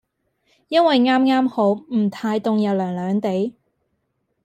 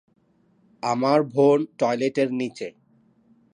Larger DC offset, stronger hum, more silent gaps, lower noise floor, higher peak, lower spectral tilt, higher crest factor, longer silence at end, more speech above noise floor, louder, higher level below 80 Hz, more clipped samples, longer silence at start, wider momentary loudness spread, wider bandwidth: neither; neither; neither; first, -72 dBFS vs -62 dBFS; about the same, -6 dBFS vs -6 dBFS; about the same, -7 dB/octave vs -6.5 dB/octave; about the same, 16 dB vs 18 dB; about the same, 0.95 s vs 0.85 s; first, 53 dB vs 41 dB; first, -19 LUFS vs -22 LUFS; first, -68 dBFS vs -76 dBFS; neither; second, 0.7 s vs 0.85 s; second, 7 LU vs 12 LU; about the same, 9.2 kHz vs 10 kHz